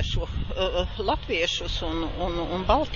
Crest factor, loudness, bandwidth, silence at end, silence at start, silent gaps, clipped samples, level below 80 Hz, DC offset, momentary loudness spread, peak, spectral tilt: 20 dB; -27 LUFS; 7.6 kHz; 0 s; 0 s; none; under 0.1%; -32 dBFS; under 0.1%; 5 LU; -6 dBFS; -5 dB/octave